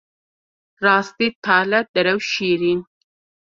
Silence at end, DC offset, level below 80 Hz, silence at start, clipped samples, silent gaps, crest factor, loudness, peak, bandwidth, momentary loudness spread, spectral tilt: 0.6 s; under 0.1%; -64 dBFS; 0.8 s; under 0.1%; 1.35-1.42 s, 1.88-1.94 s; 20 dB; -18 LUFS; -2 dBFS; 7.6 kHz; 6 LU; -4.5 dB/octave